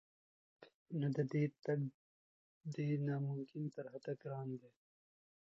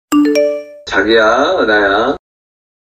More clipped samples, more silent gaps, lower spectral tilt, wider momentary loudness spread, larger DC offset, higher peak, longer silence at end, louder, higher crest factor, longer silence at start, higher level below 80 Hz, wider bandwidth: neither; first, 0.74-0.86 s, 1.94-2.61 s vs none; first, -9 dB/octave vs -3.5 dB/octave; about the same, 10 LU vs 8 LU; neither; second, -26 dBFS vs 0 dBFS; about the same, 0.8 s vs 0.75 s; second, -42 LUFS vs -12 LUFS; first, 18 dB vs 12 dB; first, 0.6 s vs 0.1 s; second, -86 dBFS vs -44 dBFS; second, 7.4 kHz vs 15.5 kHz